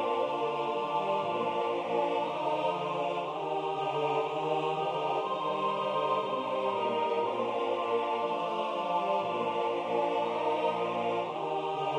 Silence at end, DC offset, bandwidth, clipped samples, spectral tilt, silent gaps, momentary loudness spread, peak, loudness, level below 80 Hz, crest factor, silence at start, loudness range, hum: 0 s; under 0.1%; 10 kHz; under 0.1%; -5.5 dB/octave; none; 2 LU; -16 dBFS; -31 LUFS; -78 dBFS; 14 dB; 0 s; 1 LU; none